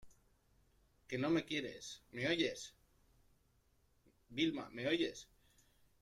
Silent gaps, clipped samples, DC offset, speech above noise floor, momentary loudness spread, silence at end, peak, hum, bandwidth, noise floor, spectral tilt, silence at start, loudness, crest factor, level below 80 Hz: none; under 0.1%; under 0.1%; 35 dB; 14 LU; 0.8 s; -22 dBFS; none; 13 kHz; -75 dBFS; -4.5 dB/octave; 0.05 s; -39 LUFS; 20 dB; -74 dBFS